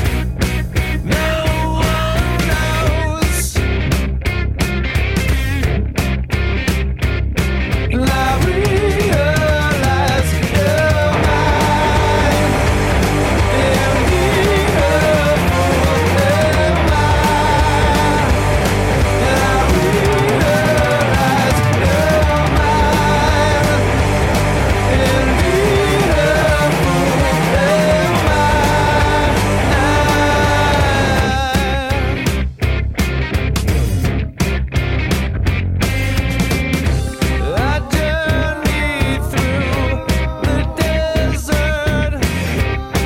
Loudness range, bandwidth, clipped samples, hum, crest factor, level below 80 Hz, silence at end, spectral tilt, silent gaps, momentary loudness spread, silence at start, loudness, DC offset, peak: 4 LU; 16.5 kHz; under 0.1%; none; 10 dB; -20 dBFS; 0 s; -5.5 dB/octave; none; 5 LU; 0 s; -15 LUFS; under 0.1%; -4 dBFS